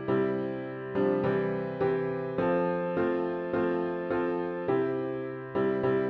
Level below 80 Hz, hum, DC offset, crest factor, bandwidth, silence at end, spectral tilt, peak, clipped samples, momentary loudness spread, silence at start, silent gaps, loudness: -62 dBFS; none; under 0.1%; 14 dB; 5 kHz; 0 s; -10 dB/octave; -16 dBFS; under 0.1%; 6 LU; 0 s; none; -30 LUFS